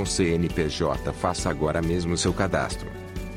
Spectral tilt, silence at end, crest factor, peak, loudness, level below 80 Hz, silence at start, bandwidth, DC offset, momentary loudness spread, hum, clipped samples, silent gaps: -5 dB/octave; 0 s; 16 dB; -10 dBFS; -25 LUFS; -38 dBFS; 0 s; 15.5 kHz; under 0.1%; 8 LU; none; under 0.1%; none